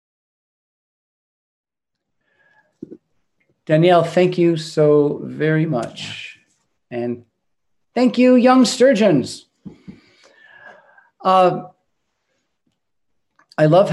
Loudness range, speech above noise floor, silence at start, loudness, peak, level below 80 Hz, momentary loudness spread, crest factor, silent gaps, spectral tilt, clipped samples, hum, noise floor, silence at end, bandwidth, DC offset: 6 LU; 65 dB; 2.9 s; -16 LUFS; 0 dBFS; -68 dBFS; 17 LU; 18 dB; none; -6 dB/octave; under 0.1%; none; -80 dBFS; 0 s; 12 kHz; under 0.1%